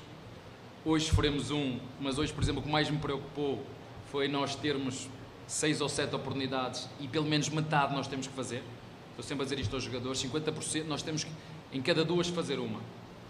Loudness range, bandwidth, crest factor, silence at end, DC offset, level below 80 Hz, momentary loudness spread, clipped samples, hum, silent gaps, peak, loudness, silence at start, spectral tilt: 3 LU; 14 kHz; 20 dB; 0 s; under 0.1%; -50 dBFS; 15 LU; under 0.1%; none; none; -14 dBFS; -33 LUFS; 0 s; -4.5 dB/octave